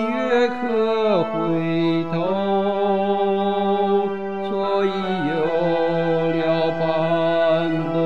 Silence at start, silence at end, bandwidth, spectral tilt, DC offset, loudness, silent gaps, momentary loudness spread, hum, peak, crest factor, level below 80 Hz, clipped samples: 0 s; 0 s; 7.4 kHz; -8 dB/octave; 1%; -20 LUFS; none; 3 LU; none; -6 dBFS; 14 dB; -62 dBFS; under 0.1%